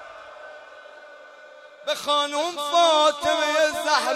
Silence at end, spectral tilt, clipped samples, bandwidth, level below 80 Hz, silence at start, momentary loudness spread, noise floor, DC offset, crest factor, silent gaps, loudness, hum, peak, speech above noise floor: 0 s; -0.5 dB/octave; under 0.1%; 15.5 kHz; -64 dBFS; 0 s; 23 LU; -46 dBFS; under 0.1%; 18 dB; none; -21 LUFS; none; -6 dBFS; 25 dB